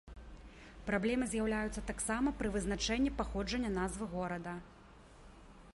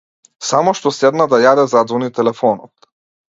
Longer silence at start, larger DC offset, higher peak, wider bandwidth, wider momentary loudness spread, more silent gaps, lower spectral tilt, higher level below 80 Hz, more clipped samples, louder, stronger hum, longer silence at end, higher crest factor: second, 0.05 s vs 0.4 s; neither; second, -20 dBFS vs 0 dBFS; first, 11.5 kHz vs 7.8 kHz; first, 21 LU vs 7 LU; neither; about the same, -4.5 dB/octave vs -4.5 dB/octave; first, -50 dBFS vs -62 dBFS; neither; second, -36 LUFS vs -14 LUFS; neither; second, 0.05 s vs 0.75 s; about the same, 18 dB vs 16 dB